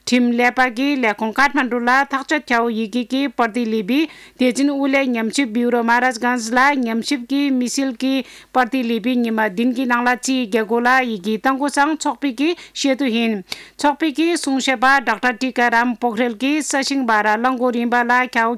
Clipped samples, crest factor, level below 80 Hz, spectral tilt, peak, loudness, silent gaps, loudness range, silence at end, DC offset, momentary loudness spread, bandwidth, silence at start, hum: under 0.1%; 14 dB; -60 dBFS; -3 dB/octave; -4 dBFS; -18 LUFS; none; 2 LU; 0 s; under 0.1%; 6 LU; 15 kHz; 0.05 s; none